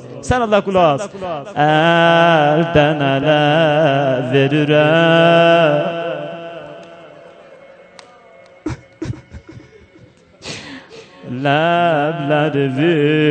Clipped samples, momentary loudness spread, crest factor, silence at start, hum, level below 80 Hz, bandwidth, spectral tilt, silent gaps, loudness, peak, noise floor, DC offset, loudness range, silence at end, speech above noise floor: under 0.1%; 19 LU; 14 dB; 0 s; none; -46 dBFS; 9 kHz; -6.5 dB/octave; none; -14 LUFS; 0 dBFS; -46 dBFS; under 0.1%; 20 LU; 0 s; 33 dB